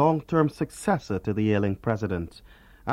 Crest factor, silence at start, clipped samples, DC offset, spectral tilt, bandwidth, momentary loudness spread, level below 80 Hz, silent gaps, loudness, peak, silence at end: 18 dB; 0 s; under 0.1%; under 0.1%; -7.5 dB/octave; 15 kHz; 9 LU; -50 dBFS; none; -26 LUFS; -8 dBFS; 0 s